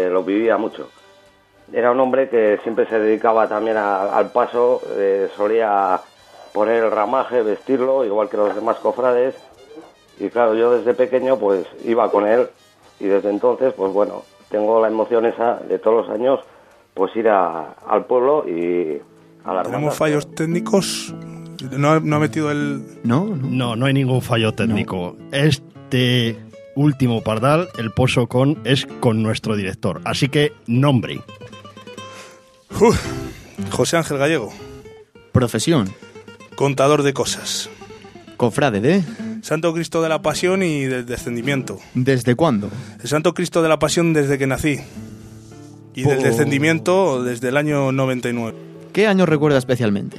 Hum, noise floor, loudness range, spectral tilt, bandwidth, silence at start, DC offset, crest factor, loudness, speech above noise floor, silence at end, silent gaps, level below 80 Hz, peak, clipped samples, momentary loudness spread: none; -51 dBFS; 3 LU; -6 dB/octave; 15 kHz; 0 s; under 0.1%; 18 dB; -19 LUFS; 34 dB; 0 s; none; -50 dBFS; 0 dBFS; under 0.1%; 12 LU